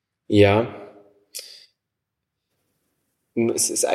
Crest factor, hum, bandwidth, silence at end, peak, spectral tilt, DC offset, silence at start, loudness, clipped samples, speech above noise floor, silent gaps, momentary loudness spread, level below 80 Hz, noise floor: 22 dB; none; 15 kHz; 0 s; -2 dBFS; -4.5 dB/octave; under 0.1%; 0.3 s; -20 LUFS; under 0.1%; 63 dB; none; 21 LU; -64 dBFS; -82 dBFS